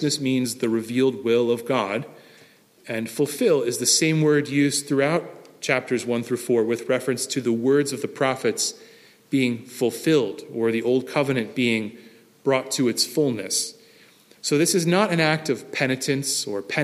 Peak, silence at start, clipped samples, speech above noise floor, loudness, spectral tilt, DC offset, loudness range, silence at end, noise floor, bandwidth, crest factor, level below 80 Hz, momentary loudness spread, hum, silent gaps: -4 dBFS; 0 s; under 0.1%; 31 dB; -23 LUFS; -4 dB/octave; under 0.1%; 3 LU; 0 s; -53 dBFS; 15.5 kHz; 18 dB; -70 dBFS; 7 LU; none; none